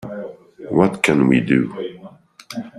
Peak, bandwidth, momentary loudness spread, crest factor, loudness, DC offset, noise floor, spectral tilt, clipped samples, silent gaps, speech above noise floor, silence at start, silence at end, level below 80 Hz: -2 dBFS; 13 kHz; 18 LU; 18 dB; -17 LUFS; under 0.1%; -43 dBFS; -6.5 dB/octave; under 0.1%; none; 26 dB; 0 s; 0 s; -54 dBFS